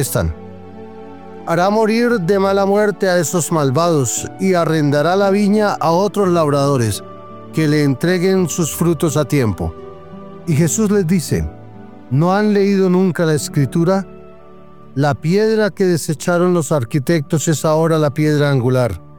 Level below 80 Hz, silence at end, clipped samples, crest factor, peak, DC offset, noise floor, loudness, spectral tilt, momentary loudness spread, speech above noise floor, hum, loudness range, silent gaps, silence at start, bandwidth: -42 dBFS; 0.2 s; under 0.1%; 12 dB; -2 dBFS; 0.9%; -41 dBFS; -16 LUFS; -6 dB/octave; 14 LU; 27 dB; none; 2 LU; none; 0 s; 19 kHz